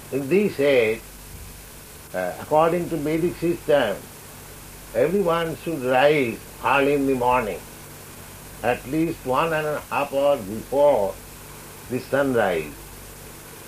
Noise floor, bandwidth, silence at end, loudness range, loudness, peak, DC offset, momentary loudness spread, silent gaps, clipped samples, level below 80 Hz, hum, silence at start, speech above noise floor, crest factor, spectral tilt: -42 dBFS; 15.5 kHz; 0 s; 3 LU; -22 LUFS; -4 dBFS; under 0.1%; 20 LU; none; under 0.1%; -48 dBFS; none; 0 s; 20 dB; 20 dB; -5.5 dB/octave